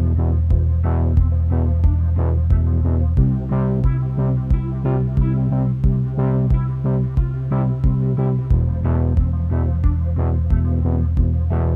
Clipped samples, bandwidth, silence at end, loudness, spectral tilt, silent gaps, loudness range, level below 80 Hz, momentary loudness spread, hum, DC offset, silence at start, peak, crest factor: under 0.1%; 2.9 kHz; 0 s; -19 LUFS; -12 dB/octave; none; 1 LU; -22 dBFS; 3 LU; none; under 0.1%; 0 s; -4 dBFS; 12 dB